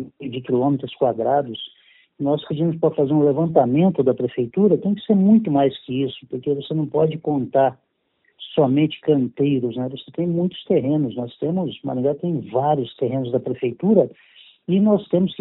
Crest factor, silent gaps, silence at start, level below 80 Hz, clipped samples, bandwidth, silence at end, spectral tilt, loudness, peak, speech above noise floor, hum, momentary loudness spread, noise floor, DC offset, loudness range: 18 dB; none; 0 s; -62 dBFS; under 0.1%; 4.1 kHz; 0.05 s; -7.5 dB/octave; -20 LUFS; -2 dBFS; 47 dB; none; 9 LU; -66 dBFS; under 0.1%; 4 LU